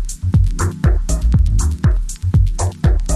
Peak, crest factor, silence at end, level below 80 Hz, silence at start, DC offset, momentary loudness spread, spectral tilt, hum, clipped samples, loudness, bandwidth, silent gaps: -2 dBFS; 12 dB; 0 s; -16 dBFS; 0 s; under 0.1%; 3 LU; -6.5 dB/octave; none; under 0.1%; -17 LUFS; 13.5 kHz; none